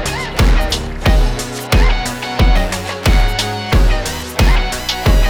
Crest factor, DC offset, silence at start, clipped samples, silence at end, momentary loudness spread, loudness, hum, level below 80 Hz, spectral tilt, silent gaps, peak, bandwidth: 12 dB; under 0.1%; 0 s; under 0.1%; 0 s; 5 LU; -16 LUFS; none; -14 dBFS; -4.5 dB/octave; none; -2 dBFS; 17 kHz